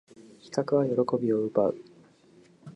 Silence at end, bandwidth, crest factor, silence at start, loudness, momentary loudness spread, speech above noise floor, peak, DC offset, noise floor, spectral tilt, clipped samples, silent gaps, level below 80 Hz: 0.05 s; 11 kHz; 18 dB; 0.2 s; -27 LUFS; 8 LU; 32 dB; -10 dBFS; under 0.1%; -58 dBFS; -7.5 dB/octave; under 0.1%; none; -72 dBFS